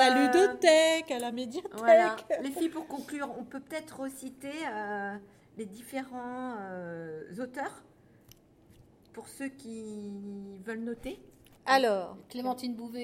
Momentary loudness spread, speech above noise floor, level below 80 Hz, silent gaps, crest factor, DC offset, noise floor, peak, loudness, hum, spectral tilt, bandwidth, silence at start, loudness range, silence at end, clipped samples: 20 LU; 29 dB; -68 dBFS; none; 22 dB; under 0.1%; -59 dBFS; -8 dBFS; -30 LUFS; none; -3.5 dB/octave; 16.5 kHz; 0 s; 15 LU; 0 s; under 0.1%